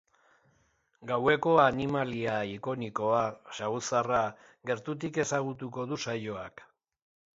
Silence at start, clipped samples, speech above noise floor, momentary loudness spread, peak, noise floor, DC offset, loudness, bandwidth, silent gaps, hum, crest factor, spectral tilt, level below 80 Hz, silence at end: 1 s; under 0.1%; 41 dB; 13 LU; -10 dBFS; -71 dBFS; under 0.1%; -30 LUFS; 8 kHz; none; none; 22 dB; -5 dB/octave; -64 dBFS; 0.75 s